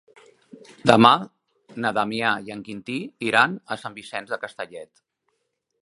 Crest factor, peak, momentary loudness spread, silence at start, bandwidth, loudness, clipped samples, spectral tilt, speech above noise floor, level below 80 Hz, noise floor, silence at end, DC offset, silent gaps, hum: 24 dB; 0 dBFS; 20 LU; 0.85 s; 11.5 kHz; -22 LUFS; under 0.1%; -5 dB/octave; 53 dB; -64 dBFS; -75 dBFS; 1 s; under 0.1%; none; none